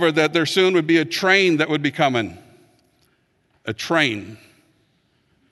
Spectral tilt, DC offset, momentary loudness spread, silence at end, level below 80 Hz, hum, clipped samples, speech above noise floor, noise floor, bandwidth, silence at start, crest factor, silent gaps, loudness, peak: -4.5 dB/octave; under 0.1%; 16 LU; 1.15 s; -60 dBFS; none; under 0.1%; 46 dB; -64 dBFS; 12.5 kHz; 0 s; 18 dB; none; -18 LUFS; -2 dBFS